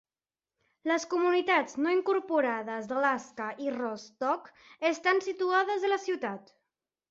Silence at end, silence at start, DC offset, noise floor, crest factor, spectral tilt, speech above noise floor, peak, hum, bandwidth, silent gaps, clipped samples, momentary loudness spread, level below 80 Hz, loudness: 0.7 s; 0.85 s; under 0.1%; under -90 dBFS; 18 dB; -3.5 dB/octave; over 61 dB; -14 dBFS; none; 7.8 kHz; none; under 0.1%; 9 LU; -80 dBFS; -30 LUFS